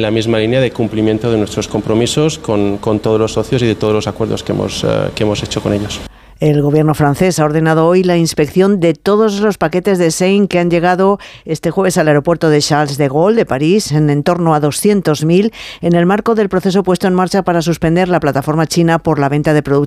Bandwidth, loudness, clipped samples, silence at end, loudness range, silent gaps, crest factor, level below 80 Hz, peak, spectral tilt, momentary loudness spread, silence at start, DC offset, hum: 15.5 kHz; -13 LUFS; under 0.1%; 0 s; 3 LU; none; 12 dB; -40 dBFS; -2 dBFS; -6 dB/octave; 5 LU; 0 s; under 0.1%; none